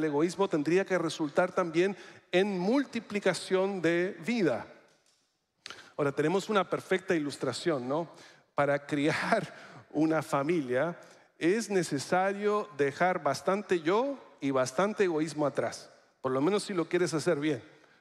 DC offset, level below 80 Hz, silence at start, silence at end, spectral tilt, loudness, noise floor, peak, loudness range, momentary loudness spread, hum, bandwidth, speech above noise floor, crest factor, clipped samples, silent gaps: under 0.1%; -78 dBFS; 0 s; 0.35 s; -5.5 dB/octave; -30 LUFS; -75 dBFS; -12 dBFS; 2 LU; 9 LU; none; 13.5 kHz; 45 dB; 18 dB; under 0.1%; none